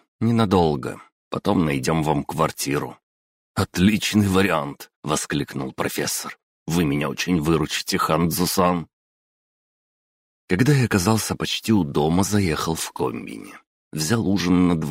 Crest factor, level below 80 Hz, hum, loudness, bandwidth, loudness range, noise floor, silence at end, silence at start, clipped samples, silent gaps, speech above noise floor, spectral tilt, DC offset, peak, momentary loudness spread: 18 dB; -46 dBFS; none; -21 LUFS; 16 kHz; 2 LU; under -90 dBFS; 0 s; 0.2 s; under 0.1%; 1.12-1.31 s, 3.03-3.54 s, 4.96-5.03 s, 6.43-6.66 s, 8.93-10.48 s, 13.67-13.91 s; over 69 dB; -5 dB/octave; under 0.1%; -4 dBFS; 13 LU